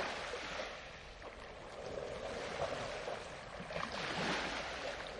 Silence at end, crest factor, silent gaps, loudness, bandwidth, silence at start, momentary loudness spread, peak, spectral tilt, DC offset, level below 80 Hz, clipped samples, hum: 0 s; 18 dB; none; -42 LUFS; 11.5 kHz; 0 s; 13 LU; -26 dBFS; -3.5 dB/octave; under 0.1%; -60 dBFS; under 0.1%; none